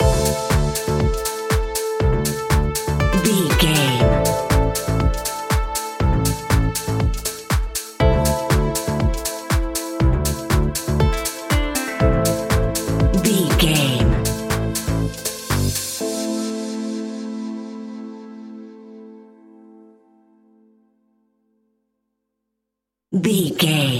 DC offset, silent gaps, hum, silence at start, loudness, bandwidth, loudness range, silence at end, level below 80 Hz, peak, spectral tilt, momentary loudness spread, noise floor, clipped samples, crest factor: under 0.1%; none; none; 0 s; -20 LUFS; 17 kHz; 11 LU; 0 s; -26 dBFS; -2 dBFS; -5 dB/octave; 11 LU; -82 dBFS; under 0.1%; 18 dB